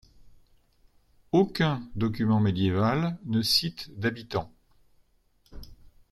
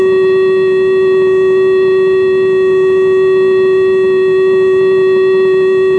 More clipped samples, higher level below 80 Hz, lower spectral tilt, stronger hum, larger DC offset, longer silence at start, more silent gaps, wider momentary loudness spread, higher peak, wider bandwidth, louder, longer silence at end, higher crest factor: neither; second, -54 dBFS vs -48 dBFS; about the same, -6 dB/octave vs -7 dB/octave; neither; neither; first, 0.25 s vs 0 s; neither; first, 10 LU vs 1 LU; second, -10 dBFS vs -4 dBFS; first, 13.5 kHz vs 4.4 kHz; second, -27 LUFS vs -10 LUFS; first, 0.4 s vs 0 s; first, 20 dB vs 4 dB